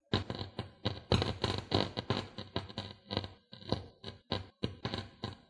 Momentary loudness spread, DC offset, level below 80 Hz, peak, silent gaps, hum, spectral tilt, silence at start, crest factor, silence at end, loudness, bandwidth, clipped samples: 12 LU; under 0.1%; -56 dBFS; -14 dBFS; none; none; -6 dB/octave; 0.1 s; 24 dB; 0.1 s; -38 LUFS; 11.5 kHz; under 0.1%